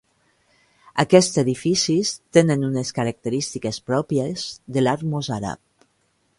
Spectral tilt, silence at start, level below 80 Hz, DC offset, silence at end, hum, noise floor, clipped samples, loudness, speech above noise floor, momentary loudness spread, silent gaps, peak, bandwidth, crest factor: -5 dB/octave; 0.95 s; -56 dBFS; under 0.1%; 0.85 s; none; -66 dBFS; under 0.1%; -21 LUFS; 46 dB; 12 LU; none; 0 dBFS; 11.5 kHz; 22 dB